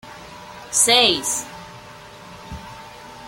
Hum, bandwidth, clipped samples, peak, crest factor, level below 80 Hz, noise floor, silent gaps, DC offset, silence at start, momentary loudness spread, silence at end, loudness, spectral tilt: none; 16.5 kHz; under 0.1%; -2 dBFS; 22 dB; -52 dBFS; -41 dBFS; none; under 0.1%; 0.05 s; 26 LU; 0 s; -16 LUFS; -0.5 dB/octave